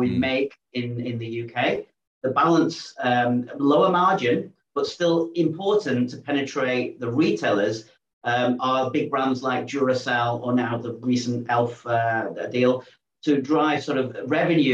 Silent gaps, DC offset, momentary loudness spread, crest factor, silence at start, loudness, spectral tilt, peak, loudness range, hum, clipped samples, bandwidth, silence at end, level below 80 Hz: 2.07-2.21 s, 8.13-8.21 s; under 0.1%; 9 LU; 16 dB; 0 s; -23 LUFS; -6 dB/octave; -8 dBFS; 2 LU; none; under 0.1%; 8.2 kHz; 0 s; -68 dBFS